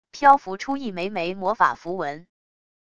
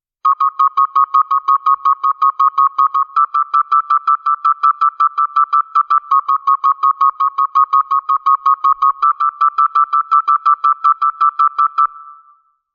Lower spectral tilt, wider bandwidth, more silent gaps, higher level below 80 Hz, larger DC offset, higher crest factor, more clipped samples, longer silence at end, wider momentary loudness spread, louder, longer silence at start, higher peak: first, -5 dB/octave vs 5 dB/octave; first, 7.4 kHz vs 6.6 kHz; neither; first, -62 dBFS vs -74 dBFS; first, 0.4% vs under 0.1%; first, 22 dB vs 12 dB; neither; first, 0.8 s vs 0.6 s; first, 13 LU vs 2 LU; second, -23 LUFS vs -13 LUFS; about the same, 0.15 s vs 0.25 s; about the same, -2 dBFS vs -2 dBFS